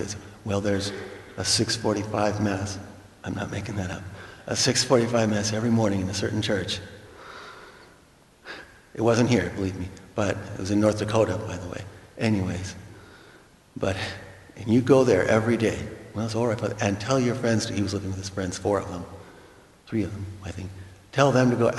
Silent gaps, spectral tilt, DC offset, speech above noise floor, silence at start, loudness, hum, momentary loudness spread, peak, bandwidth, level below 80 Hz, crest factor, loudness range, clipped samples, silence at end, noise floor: none; -5 dB/octave; under 0.1%; 31 dB; 0 s; -25 LUFS; none; 20 LU; -4 dBFS; 12 kHz; -54 dBFS; 22 dB; 6 LU; under 0.1%; 0 s; -55 dBFS